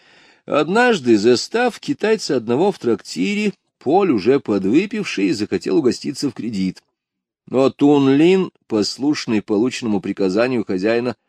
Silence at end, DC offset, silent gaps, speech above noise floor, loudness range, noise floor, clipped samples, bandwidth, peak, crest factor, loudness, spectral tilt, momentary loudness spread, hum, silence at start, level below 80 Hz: 0.15 s; under 0.1%; none; 65 dB; 2 LU; -82 dBFS; under 0.1%; 11 kHz; -2 dBFS; 16 dB; -18 LUFS; -5.5 dB/octave; 9 LU; none; 0.5 s; -64 dBFS